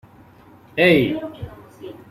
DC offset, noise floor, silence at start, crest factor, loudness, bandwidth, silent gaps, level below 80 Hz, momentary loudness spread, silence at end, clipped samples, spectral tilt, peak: under 0.1%; -48 dBFS; 0.75 s; 20 dB; -18 LUFS; 15.5 kHz; none; -52 dBFS; 24 LU; 0.2 s; under 0.1%; -6.5 dB/octave; -2 dBFS